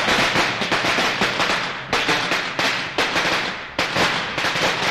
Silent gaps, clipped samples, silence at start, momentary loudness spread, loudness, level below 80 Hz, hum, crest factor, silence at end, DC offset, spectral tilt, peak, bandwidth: none; under 0.1%; 0 s; 4 LU; -19 LUFS; -48 dBFS; none; 16 dB; 0 s; 0.1%; -2.5 dB/octave; -6 dBFS; 16 kHz